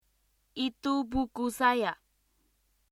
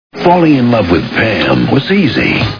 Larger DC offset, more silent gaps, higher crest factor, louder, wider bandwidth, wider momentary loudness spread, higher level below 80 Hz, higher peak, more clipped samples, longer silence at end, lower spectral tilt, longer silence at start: second, under 0.1% vs 0.6%; neither; first, 22 dB vs 10 dB; second, -30 LUFS vs -10 LUFS; first, 15 kHz vs 5.4 kHz; first, 11 LU vs 3 LU; second, -54 dBFS vs -36 dBFS; second, -12 dBFS vs 0 dBFS; second, under 0.1% vs 0.2%; first, 0.95 s vs 0 s; second, -4 dB/octave vs -7.5 dB/octave; first, 0.55 s vs 0.15 s